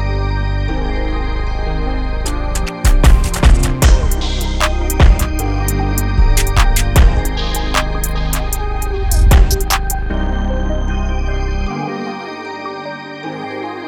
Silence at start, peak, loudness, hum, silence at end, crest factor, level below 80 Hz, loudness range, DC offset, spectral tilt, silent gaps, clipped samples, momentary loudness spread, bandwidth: 0 s; 0 dBFS; -17 LUFS; none; 0 s; 14 dB; -14 dBFS; 6 LU; under 0.1%; -5 dB/octave; none; under 0.1%; 12 LU; 18 kHz